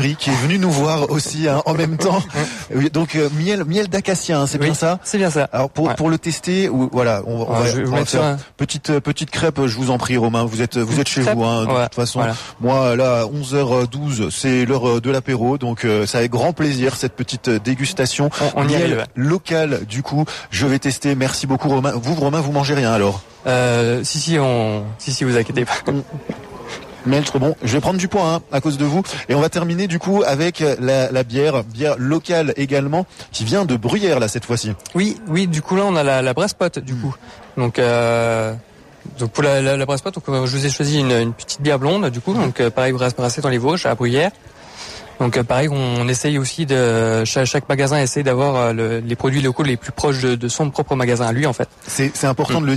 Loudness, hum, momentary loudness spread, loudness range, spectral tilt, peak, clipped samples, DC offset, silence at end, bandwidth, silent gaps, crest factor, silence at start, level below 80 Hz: -18 LUFS; none; 6 LU; 2 LU; -5.5 dB/octave; -4 dBFS; under 0.1%; under 0.1%; 0 s; 14 kHz; none; 12 dB; 0 s; -48 dBFS